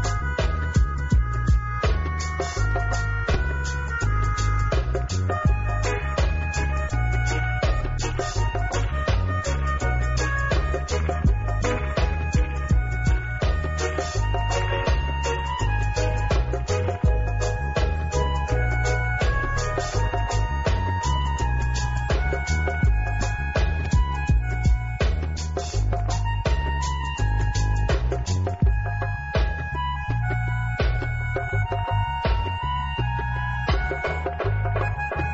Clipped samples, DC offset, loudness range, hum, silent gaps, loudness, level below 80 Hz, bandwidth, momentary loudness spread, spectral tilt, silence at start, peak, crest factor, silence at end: under 0.1%; under 0.1%; 1 LU; none; none; -25 LUFS; -26 dBFS; 7.8 kHz; 3 LU; -5 dB/octave; 0 s; -10 dBFS; 14 dB; 0 s